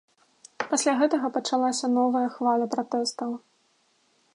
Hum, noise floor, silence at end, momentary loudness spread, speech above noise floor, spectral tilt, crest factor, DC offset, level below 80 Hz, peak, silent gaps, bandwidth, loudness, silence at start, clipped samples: none; -67 dBFS; 0.95 s; 11 LU; 42 dB; -2.5 dB/octave; 18 dB; under 0.1%; -82 dBFS; -10 dBFS; none; 11.5 kHz; -25 LUFS; 0.6 s; under 0.1%